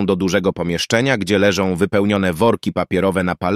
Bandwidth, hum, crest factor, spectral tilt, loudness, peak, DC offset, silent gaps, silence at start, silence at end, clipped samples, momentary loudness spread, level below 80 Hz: 15 kHz; none; 14 dB; -5.5 dB/octave; -17 LUFS; -2 dBFS; under 0.1%; none; 0 s; 0 s; under 0.1%; 4 LU; -46 dBFS